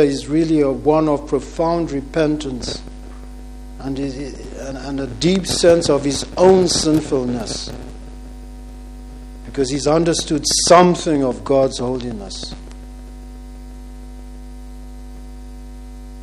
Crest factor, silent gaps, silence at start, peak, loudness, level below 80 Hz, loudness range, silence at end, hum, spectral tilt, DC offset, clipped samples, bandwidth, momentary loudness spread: 18 dB; none; 0 s; 0 dBFS; -17 LUFS; -34 dBFS; 15 LU; 0 s; none; -4.5 dB/octave; under 0.1%; under 0.1%; 13 kHz; 24 LU